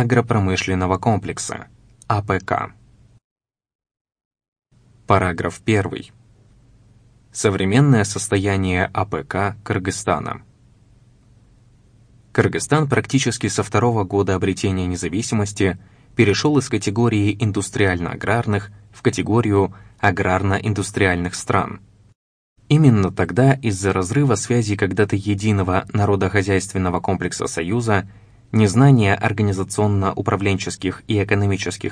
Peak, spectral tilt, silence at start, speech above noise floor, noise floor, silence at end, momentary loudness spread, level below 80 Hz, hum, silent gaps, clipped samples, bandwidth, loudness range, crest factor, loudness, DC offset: 0 dBFS; -6 dB/octave; 0 s; 33 dB; -52 dBFS; 0 s; 8 LU; -48 dBFS; none; 3.24-3.36 s, 3.75-3.79 s, 4.01-4.05 s, 4.25-4.31 s, 4.48-4.52 s, 22.15-22.56 s; under 0.1%; 10.5 kHz; 6 LU; 20 dB; -19 LUFS; under 0.1%